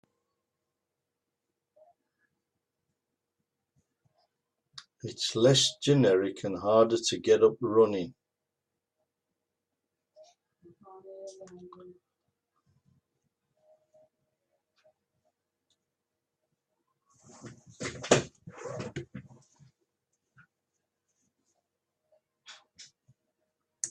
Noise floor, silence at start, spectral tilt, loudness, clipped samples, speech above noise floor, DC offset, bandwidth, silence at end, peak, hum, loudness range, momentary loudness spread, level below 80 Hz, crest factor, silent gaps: -87 dBFS; 4.75 s; -4.5 dB/octave; -26 LUFS; under 0.1%; 61 dB; under 0.1%; 12 kHz; 0 s; -6 dBFS; none; 22 LU; 26 LU; -72 dBFS; 28 dB; none